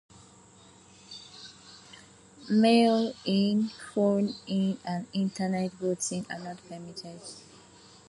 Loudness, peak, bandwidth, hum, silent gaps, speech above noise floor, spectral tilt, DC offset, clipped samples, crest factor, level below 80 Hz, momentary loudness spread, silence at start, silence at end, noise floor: -28 LUFS; -10 dBFS; 11.5 kHz; none; none; 28 dB; -5.5 dB/octave; under 0.1%; under 0.1%; 20 dB; -70 dBFS; 24 LU; 1.1 s; 0.7 s; -55 dBFS